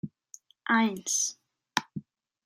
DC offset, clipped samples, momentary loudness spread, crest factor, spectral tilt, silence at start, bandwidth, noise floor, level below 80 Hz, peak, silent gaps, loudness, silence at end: under 0.1%; under 0.1%; 18 LU; 26 dB; -2 dB/octave; 0.05 s; 16 kHz; -56 dBFS; -76 dBFS; -6 dBFS; none; -29 LUFS; 0.45 s